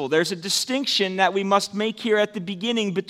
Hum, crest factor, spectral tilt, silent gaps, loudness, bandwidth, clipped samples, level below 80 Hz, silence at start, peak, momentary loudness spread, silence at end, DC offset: none; 20 dB; -3.5 dB/octave; none; -22 LUFS; 16 kHz; under 0.1%; -74 dBFS; 0 s; -4 dBFS; 6 LU; 0 s; under 0.1%